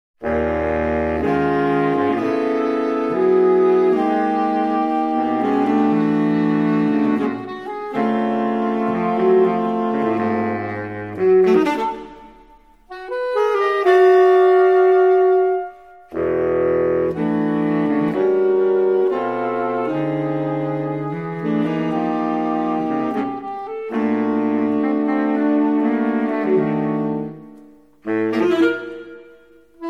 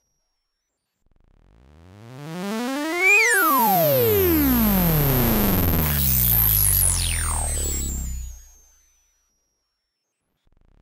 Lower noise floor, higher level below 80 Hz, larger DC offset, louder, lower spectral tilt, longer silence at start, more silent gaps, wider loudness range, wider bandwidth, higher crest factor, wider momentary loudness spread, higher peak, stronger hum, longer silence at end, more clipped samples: second, -49 dBFS vs -78 dBFS; second, -48 dBFS vs -32 dBFS; first, 0.2% vs under 0.1%; about the same, -18 LUFS vs -18 LUFS; first, -8 dB/octave vs -4 dB/octave; second, 0.2 s vs 1.95 s; neither; second, 6 LU vs 12 LU; second, 6.4 kHz vs 16 kHz; about the same, 14 dB vs 14 dB; second, 11 LU vs 15 LU; first, -4 dBFS vs -8 dBFS; neither; second, 0 s vs 2.45 s; neither